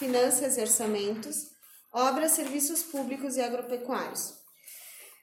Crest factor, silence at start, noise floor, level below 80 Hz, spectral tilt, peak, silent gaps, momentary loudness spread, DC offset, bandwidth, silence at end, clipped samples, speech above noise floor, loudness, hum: 20 dB; 0 s; -50 dBFS; -78 dBFS; -2 dB/octave; -10 dBFS; none; 20 LU; under 0.1%; 17 kHz; 0.1 s; under 0.1%; 21 dB; -28 LUFS; none